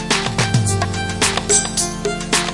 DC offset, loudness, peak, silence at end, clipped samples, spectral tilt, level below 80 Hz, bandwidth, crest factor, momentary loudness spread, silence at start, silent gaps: under 0.1%; -17 LUFS; -2 dBFS; 0 s; under 0.1%; -3 dB/octave; -36 dBFS; 11.5 kHz; 16 dB; 6 LU; 0 s; none